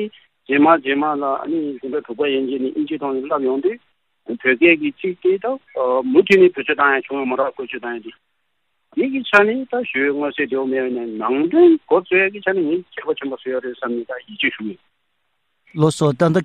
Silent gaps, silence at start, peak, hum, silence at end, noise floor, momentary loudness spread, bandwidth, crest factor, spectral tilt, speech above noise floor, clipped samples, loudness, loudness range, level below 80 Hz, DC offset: none; 0 s; 0 dBFS; none; 0 s; -72 dBFS; 13 LU; 10.5 kHz; 18 dB; -6.5 dB/octave; 54 dB; under 0.1%; -18 LUFS; 6 LU; -64 dBFS; under 0.1%